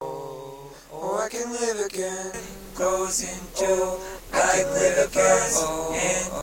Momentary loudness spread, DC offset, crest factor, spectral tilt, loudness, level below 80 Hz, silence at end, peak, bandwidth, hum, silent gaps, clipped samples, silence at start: 17 LU; under 0.1%; 18 dB; -2.5 dB/octave; -24 LUFS; -46 dBFS; 0 s; -6 dBFS; 16.5 kHz; none; none; under 0.1%; 0 s